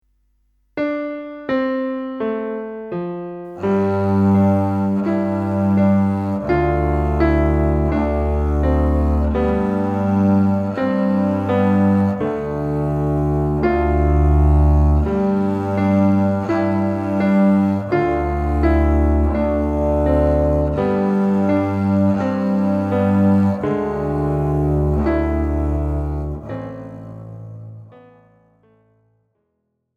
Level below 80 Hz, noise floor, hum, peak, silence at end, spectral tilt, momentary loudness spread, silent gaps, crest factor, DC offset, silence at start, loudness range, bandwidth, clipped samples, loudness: -24 dBFS; -72 dBFS; none; -4 dBFS; 2.05 s; -10 dB/octave; 10 LU; none; 14 dB; under 0.1%; 0.75 s; 6 LU; 5 kHz; under 0.1%; -18 LUFS